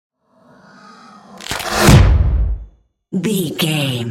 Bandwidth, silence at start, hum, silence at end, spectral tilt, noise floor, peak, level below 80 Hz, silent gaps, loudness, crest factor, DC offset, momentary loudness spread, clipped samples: 16.5 kHz; 1.35 s; none; 0 s; -5 dB/octave; -50 dBFS; 0 dBFS; -22 dBFS; none; -15 LUFS; 16 dB; under 0.1%; 16 LU; under 0.1%